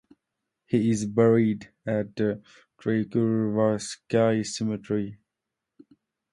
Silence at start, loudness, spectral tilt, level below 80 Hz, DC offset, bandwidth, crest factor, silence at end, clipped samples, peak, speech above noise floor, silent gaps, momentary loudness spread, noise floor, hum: 0.7 s; -26 LUFS; -6.5 dB/octave; -62 dBFS; under 0.1%; 11.5 kHz; 20 dB; 1.15 s; under 0.1%; -8 dBFS; 61 dB; none; 10 LU; -86 dBFS; none